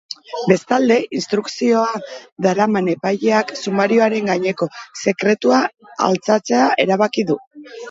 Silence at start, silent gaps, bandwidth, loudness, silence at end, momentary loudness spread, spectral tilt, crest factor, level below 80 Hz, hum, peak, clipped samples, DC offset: 0.1 s; 2.32-2.36 s, 7.47-7.51 s; 8 kHz; -17 LUFS; 0 s; 9 LU; -5 dB/octave; 18 dB; -66 dBFS; none; 0 dBFS; under 0.1%; under 0.1%